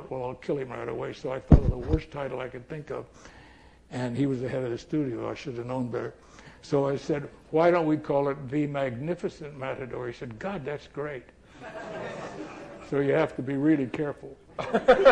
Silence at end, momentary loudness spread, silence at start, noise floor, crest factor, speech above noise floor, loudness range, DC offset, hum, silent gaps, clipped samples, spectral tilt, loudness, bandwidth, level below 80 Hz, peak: 0 s; 17 LU; 0 s; -53 dBFS; 26 dB; 26 dB; 7 LU; under 0.1%; none; none; under 0.1%; -7.5 dB/octave; -29 LUFS; 9.4 kHz; -38 dBFS; -2 dBFS